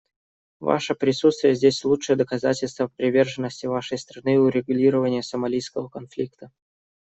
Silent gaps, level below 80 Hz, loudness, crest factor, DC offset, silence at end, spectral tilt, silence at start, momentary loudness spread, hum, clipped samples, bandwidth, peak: none; -62 dBFS; -23 LUFS; 18 dB; under 0.1%; 0.6 s; -5.5 dB/octave; 0.6 s; 12 LU; none; under 0.1%; 8.2 kHz; -4 dBFS